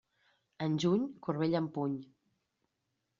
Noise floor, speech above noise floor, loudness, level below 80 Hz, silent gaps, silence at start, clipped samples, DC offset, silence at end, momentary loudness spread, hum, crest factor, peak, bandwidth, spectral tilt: -83 dBFS; 51 dB; -34 LUFS; -74 dBFS; none; 0.6 s; under 0.1%; under 0.1%; 1.15 s; 8 LU; none; 18 dB; -18 dBFS; 7.4 kHz; -6.5 dB/octave